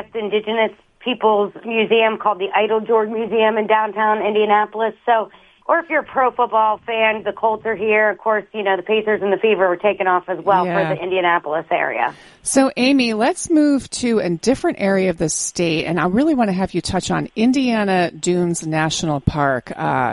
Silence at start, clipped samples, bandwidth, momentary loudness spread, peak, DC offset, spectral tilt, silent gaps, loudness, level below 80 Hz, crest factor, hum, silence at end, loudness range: 0 s; under 0.1%; 11.5 kHz; 5 LU; -2 dBFS; under 0.1%; -4.5 dB/octave; none; -18 LUFS; -46 dBFS; 16 dB; none; 0 s; 1 LU